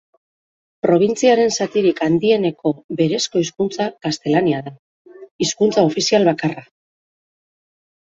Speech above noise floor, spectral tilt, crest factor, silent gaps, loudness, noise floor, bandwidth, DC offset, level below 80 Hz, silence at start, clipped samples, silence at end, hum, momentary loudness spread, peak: over 73 dB; -5 dB/octave; 16 dB; 2.84-2.89 s, 4.79-5.05 s, 5.31-5.39 s; -18 LUFS; under -90 dBFS; 8 kHz; under 0.1%; -60 dBFS; 0.85 s; under 0.1%; 1.4 s; none; 9 LU; -2 dBFS